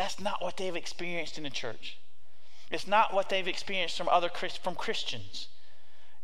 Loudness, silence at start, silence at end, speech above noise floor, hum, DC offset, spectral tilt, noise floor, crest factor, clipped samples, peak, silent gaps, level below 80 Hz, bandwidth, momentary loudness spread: -32 LUFS; 0 s; 0.75 s; 32 dB; none; 3%; -3 dB/octave; -64 dBFS; 22 dB; under 0.1%; -12 dBFS; none; -66 dBFS; 15.5 kHz; 13 LU